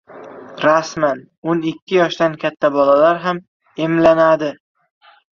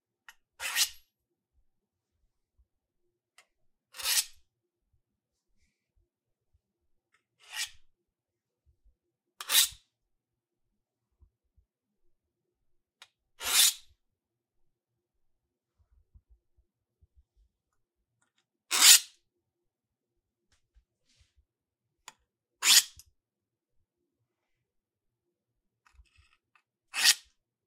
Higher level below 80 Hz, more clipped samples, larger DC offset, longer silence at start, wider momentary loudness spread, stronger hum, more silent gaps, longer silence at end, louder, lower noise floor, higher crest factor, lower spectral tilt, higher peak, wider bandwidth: first, -56 dBFS vs -72 dBFS; neither; neither; second, 0.15 s vs 0.6 s; second, 14 LU vs 22 LU; neither; first, 1.38-1.42 s, 1.82-1.87 s, 3.48-3.60 s vs none; first, 0.8 s vs 0.5 s; first, -16 LUFS vs -23 LUFS; second, -36 dBFS vs -89 dBFS; second, 16 dB vs 34 dB; first, -6 dB/octave vs 4 dB/octave; about the same, 0 dBFS vs -2 dBFS; second, 7.2 kHz vs 16 kHz